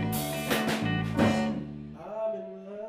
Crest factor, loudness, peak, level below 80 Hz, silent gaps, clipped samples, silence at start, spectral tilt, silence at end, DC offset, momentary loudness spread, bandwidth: 20 dB; -29 LUFS; -10 dBFS; -52 dBFS; none; under 0.1%; 0 s; -5.5 dB/octave; 0 s; under 0.1%; 14 LU; 16 kHz